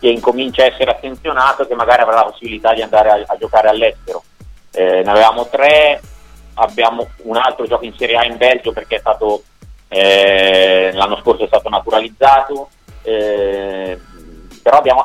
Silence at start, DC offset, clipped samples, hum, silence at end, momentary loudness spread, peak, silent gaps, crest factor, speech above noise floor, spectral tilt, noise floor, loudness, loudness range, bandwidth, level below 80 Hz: 0 s; under 0.1%; under 0.1%; none; 0 s; 13 LU; 0 dBFS; none; 14 dB; 26 dB; -4 dB/octave; -38 dBFS; -13 LUFS; 4 LU; 14 kHz; -40 dBFS